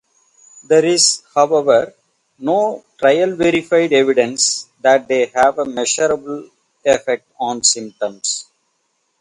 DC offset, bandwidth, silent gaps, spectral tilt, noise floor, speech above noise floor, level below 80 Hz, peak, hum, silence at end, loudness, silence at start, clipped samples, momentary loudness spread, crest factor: under 0.1%; 11.5 kHz; none; -2 dB/octave; -67 dBFS; 51 dB; -58 dBFS; 0 dBFS; none; 0.8 s; -16 LUFS; 0.7 s; under 0.1%; 10 LU; 16 dB